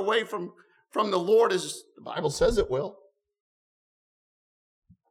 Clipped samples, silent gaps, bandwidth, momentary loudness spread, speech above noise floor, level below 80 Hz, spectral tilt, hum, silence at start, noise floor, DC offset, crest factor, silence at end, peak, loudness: under 0.1%; none; 14 kHz; 15 LU; over 64 dB; -48 dBFS; -4 dB/octave; none; 0 s; under -90 dBFS; under 0.1%; 18 dB; 2.15 s; -10 dBFS; -27 LUFS